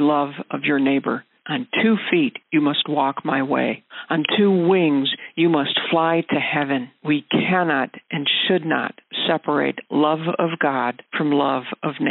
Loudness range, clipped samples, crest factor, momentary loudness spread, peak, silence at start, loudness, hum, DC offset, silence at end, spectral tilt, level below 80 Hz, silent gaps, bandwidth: 2 LU; under 0.1%; 18 dB; 7 LU; -4 dBFS; 0 s; -20 LUFS; none; under 0.1%; 0 s; -3 dB/octave; -70 dBFS; none; 4.2 kHz